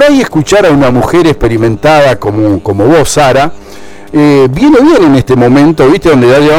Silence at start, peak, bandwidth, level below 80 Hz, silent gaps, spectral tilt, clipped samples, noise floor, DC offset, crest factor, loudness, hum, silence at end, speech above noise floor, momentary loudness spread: 0 s; 0 dBFS; 16 kHz; -28 dBFS; none; -6 dB/octave; 0.4%; -28 dBFS; under 0.1%; 6 dB; -6 LUFS; none; 0 s; 23 dB; 5 LU